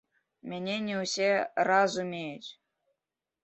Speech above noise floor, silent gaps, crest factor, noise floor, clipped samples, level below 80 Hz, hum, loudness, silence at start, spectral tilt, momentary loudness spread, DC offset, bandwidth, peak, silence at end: 59 dB; none; 20 dB; -89 dBFS; under 0.1%; -78 dBFS; none; -29 LUFS; 0.45 s; -4 dB/octave; 18 LU; under 0.1%; 8.2 kHz; -12 dBFS; 0.9 s